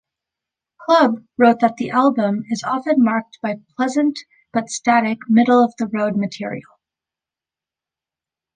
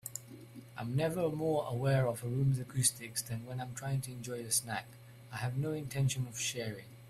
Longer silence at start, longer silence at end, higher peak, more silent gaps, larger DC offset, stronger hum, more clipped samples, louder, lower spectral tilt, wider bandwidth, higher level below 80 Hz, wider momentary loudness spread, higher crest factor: first, 0.8 s vs 0.05 s; first, 1.95 s vs 0 s; first, -2 dBFS vs -16 dBFS; neither; neither; neither; neither; first, -18 LUFS vs -35 LUFS; about the same, -5.5 dB/octave vs -4.5 dB/octave; second, 9.6 kHz vs 15 kHz; about the same, -66 dBFS vs -64 dBFS; about the same, 12 LU vs 14 LU; about the same, 18 dB vs 20 dB